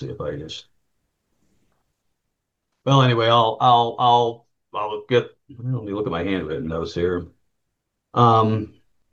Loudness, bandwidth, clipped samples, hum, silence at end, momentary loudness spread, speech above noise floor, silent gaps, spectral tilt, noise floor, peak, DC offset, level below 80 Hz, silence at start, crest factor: -20 LUFS; 7.4 kHz; under 0.1%; none; 0.45 s; 17 LU; 58 dB; none; -7 dB/octave; -78 dBFS; -2 dBFS; under 0.1%; -52 dBFS; 0 s; 20 dB